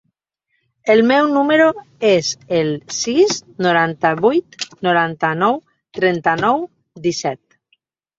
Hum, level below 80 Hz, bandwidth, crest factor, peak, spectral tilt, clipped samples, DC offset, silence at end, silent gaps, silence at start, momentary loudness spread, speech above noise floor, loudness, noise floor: none; -60 dBFS; 7.8 kHz; 18 dB; 0 dBFS; -4.5 dB/octave; under 0.1%; under 0.1%; 0.85 s; none; 0.85 s; 10 LU; 55 dB; -17 LUFS; -71 dBFS